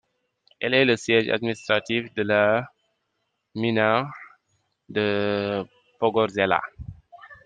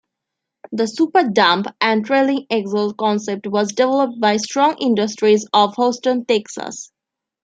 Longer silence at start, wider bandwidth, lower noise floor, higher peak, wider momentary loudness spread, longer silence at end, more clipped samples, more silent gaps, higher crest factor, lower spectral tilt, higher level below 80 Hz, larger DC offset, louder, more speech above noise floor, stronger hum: about the same, 0.6 s vs 0.7 s; about the same, 9.4 kHz vs 9.4 kHz; second, -76 dBFS vs -81 dBFS; second, -4 dBFS vs 0 dBFS; first, 18 LU vs 8 LU; second, 0.1 s vs 0.6 s; neither; neither; first, 22 dB vs 16 dB; first, -5.5 dB/octave vs -4 dB/octave; first, -58 dBFS vs -70 dBFS; neither; second, -23 LUFS vs -17 LUFS; second, 53 dB vs 64 dB; neither